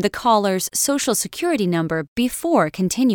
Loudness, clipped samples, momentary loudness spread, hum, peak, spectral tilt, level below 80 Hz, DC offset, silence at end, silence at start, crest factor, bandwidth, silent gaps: -20 LUFS; under 0.1%; 4 LU; none; -4 dBFS; -4 dB/octave; -52 dBFS; under 0.1%; 0 s; 0 s; 16 dB; over 20 kHz; 2.08-2.16 s